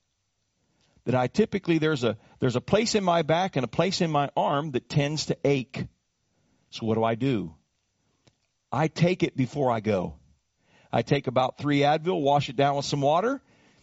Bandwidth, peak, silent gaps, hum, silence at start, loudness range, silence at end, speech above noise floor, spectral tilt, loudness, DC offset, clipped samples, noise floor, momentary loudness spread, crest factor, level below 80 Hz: 8 kHz; -6 dBFS; none; none; 1.05 s; 4 LU; 0.45 s; 51 dB; -5 dB/octave; -26 LUFS; under 0.1%; under 0.1%; -76 dBFS; 7 LU; 20 dB; -58 dBFS